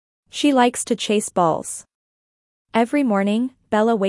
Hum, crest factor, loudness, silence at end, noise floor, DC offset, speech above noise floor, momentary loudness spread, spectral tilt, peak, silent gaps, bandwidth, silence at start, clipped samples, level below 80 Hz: none; 16 dB; -20 LUFS; 0 s; under -90 dBFS; under 0.1%; over 71 dB; 9 LU; -4.5 dB/octave; -4 dBFS; 1.95-2.65 s; 12 kHz; 0.35 s; under 0.1%; -64 dBFS